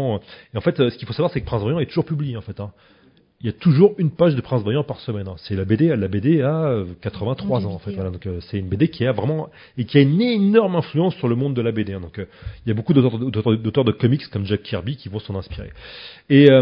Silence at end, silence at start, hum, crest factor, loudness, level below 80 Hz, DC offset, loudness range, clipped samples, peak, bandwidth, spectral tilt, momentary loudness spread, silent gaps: 0 s; 0 s; none; 20 dB; -20 LUFS; -44 dBFS; under 0.1%; 4 LU; under 0.1%; 0 dBFS; 5.4 kHz; -11 dB/octave; 14 LU; none